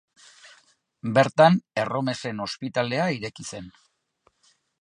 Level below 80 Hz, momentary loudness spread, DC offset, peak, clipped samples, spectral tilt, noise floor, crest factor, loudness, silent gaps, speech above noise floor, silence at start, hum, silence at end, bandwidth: -66 dBFS; 18 LU; under 0.1%; -4 dBFS; under 0.1%; -5.5 dB/octave; -68 dBFS; 22 dB; -24 LUFS; none; 44 dB; 1.05 s; none; 1.15 s; 11 kHz